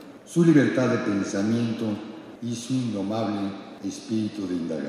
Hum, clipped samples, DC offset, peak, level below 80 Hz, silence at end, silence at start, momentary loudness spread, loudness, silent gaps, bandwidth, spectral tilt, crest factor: none; under 0.1%; under 0.1%; -6 dBFS; -70 dBFS; 0 s; 0 s; 15 LU; -25 LUFS; none; 13 kHz; -6.5 dB/octave; 18 dB